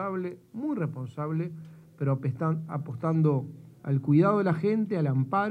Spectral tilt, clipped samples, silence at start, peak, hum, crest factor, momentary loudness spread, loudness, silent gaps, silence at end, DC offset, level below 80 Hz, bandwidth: -10.5 dB/octave; under 0.1%; 0 s; -12 dBFS; none; 16 dB; 12 LU; -28 LUFS; none; 0 s; under 0.1%; -72 dBFS; 4.8 kHz